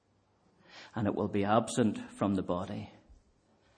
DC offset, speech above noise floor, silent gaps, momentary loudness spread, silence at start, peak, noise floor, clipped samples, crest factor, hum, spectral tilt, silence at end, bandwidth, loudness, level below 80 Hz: under 0.1%; 39 dB; none; 15 LU; 0.75 s; -12 dBFS; -70 dBFS; under 0.1%; 22 dB; none; -6 dB/octave; 0.65 s; 10 kHz; -32 LUFS; -66 dBFS